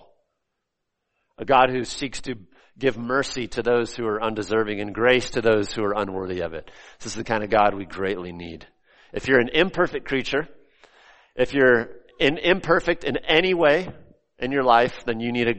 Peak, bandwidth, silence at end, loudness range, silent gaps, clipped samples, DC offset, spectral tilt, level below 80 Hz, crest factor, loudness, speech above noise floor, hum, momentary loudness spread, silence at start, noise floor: -2 dBFS; 8.8 kHz; 0 s; 5 LU; none; under 0.1%; under 0.1%; -4.5 dB/octave; -48 dBFS; 20 dB; -22 LUFS; 57 dB; none; 17 LU; 1.4 s; -80 dBFS